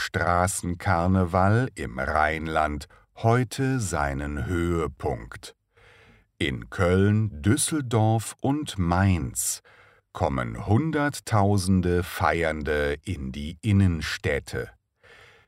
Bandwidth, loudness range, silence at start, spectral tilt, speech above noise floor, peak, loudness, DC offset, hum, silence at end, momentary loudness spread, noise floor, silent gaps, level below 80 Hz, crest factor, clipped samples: 16 kHz; 4 LU; 0 s; -5.5 dB/octave; 32 dB; -6 dBFS; -25 LUFS; under 0.1%; none; 0.8 s; 10 LU; -56 dBFS; none; -42 dBFS; 18 dB; under 0.1%